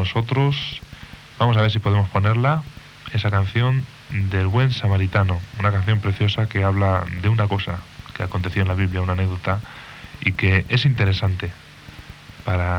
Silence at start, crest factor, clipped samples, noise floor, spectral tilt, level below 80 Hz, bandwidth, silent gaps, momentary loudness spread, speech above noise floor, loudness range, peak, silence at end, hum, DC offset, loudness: 0 s; 18 dB; under 0.1%; -40 dBFS; -7.5 dB/octave; -46 dBFS; 6.8 kHz; none; 19 LU; 21 dB; 2 LU; -2 dBFS; 0 s; none; under 0.1%; -21 LUFS